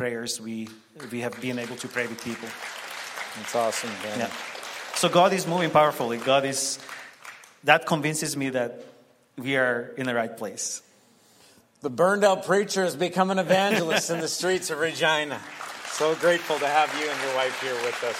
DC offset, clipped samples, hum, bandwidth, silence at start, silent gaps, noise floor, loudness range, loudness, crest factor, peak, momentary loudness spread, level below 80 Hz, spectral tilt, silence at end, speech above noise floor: under 0.1%; under 0.1%; none; 16 kHz; 0 s; none; -58 dBFS; 7 LU; -25 LUFS; 24 dB; -2 dBFS; 14 LU; -74 dBFS; -3.5 dB/octave; 0 s; 33 dB